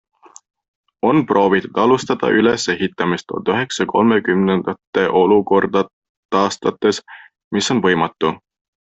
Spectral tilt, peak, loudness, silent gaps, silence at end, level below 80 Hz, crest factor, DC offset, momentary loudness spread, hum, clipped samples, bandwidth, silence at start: -5 dB/octave; -2 dBFS; -17 LUFS; 4.87-4.93 s, 5.93-6.02 s, 6.09-6.29 s, 7.44-7.51 s; 0.55 s; -56 dBFS; 16 dB; under 0.1%; 7 LU; none; under 0.1%; 8.4 kHz; 1.05 s